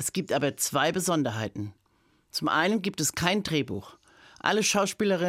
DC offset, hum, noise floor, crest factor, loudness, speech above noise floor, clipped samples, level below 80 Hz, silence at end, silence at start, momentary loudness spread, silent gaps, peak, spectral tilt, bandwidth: under 0.1%; none; -67 dBFS; 22 dB; -27 LUFS; 40 dB; under 0.1%; -62 dBFS; 0 s; 0 s; 10 LU; none; -6 dBFS; -3.5 dB/octave; 16 kHz